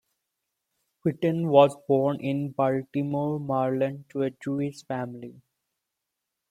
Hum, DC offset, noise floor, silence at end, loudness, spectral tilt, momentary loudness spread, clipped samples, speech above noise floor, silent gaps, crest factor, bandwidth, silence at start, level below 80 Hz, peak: none; under 0.1%; -84 dBFS; 1.2 s; -26 LUFS; -8 dB/octave; 13 LU; under 0.1%; 59 dB; none; 22 dB; 13 kHz; 1.05 s; -70 dBFS; -4 dBFS